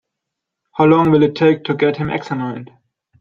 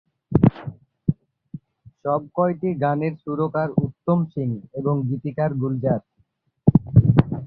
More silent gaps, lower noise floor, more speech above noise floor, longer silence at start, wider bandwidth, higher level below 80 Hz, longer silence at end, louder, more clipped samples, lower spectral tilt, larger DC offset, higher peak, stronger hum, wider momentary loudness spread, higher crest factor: neither; first, -80 dBFS vs -66 dBFS; first, 65 dB vs 43 dB; first, 0.8 s vs 0.3 s; first, 7 kHz vs 4.5 kHz; second, -52 dBFS vs -42 dBFS; first, 0.55 s vs 0 s; first, -15 LUFS vs -22 LUFS; neither; second, -8.5 dB/octave vs -12.5 dB/octave; neither; about the same, -2 dBFS vs -2 dBFS; neither; about the same, 14 LU vs 16 LU; about the same, 16 dB vs 20 dB